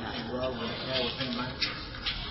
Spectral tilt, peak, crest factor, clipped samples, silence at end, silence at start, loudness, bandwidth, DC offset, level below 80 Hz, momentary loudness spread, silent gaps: -7 dB/octave; -14 dBFS; 18 dB; under 0.1%; 0 s; 0 s; -32 LUFS; 6 kHz; under 0.1%; -48 dBFS; 4 LU; none